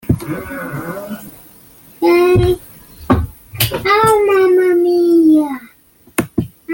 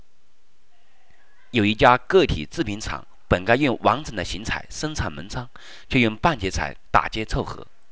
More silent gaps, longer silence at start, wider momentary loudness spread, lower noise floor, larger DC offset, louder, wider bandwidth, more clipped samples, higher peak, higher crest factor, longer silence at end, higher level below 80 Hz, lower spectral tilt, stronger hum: neither; second, 0.05 s vs 1.55 s; about the same, 15 LU vs 16 LU; second, -48 dBFS vs -66 dBFS; second, under 0.1% vs 1%; first, -14 LUFS vs -22 LUFS; first, 17 kHz vs 8 kHz; neither; about the same, 0 dBFS vs 0 dBFS; second, 14 dB vs 24 dB; second, 0 s vs 0.3 s; about the same, -36 dBFS vs -38 dBFS; about the same, -6 dB/octave vs -5 dB/octave; neither